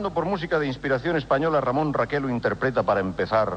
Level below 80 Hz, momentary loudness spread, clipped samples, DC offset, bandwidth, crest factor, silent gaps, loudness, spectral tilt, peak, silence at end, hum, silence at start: -48 dBFS; 3 LU; under 0.1%; under 0.1%; 8.8 kHz; 14 dB; none; -24 LUFS; -7.5 dB/octave; -10 dBFS; 0 s; none; 0 s